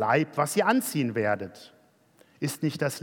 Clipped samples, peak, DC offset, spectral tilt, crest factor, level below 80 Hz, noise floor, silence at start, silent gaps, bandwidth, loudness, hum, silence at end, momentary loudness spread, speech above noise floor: under 0.1%; -8 dBFS; under 0.1%; -5 dB/octave; 18 dB; -78 dBFS; -61 dBFS; 0 s; none; 18 kHz; -27 LUFS; none; 0 s; 10 LU; 34 dB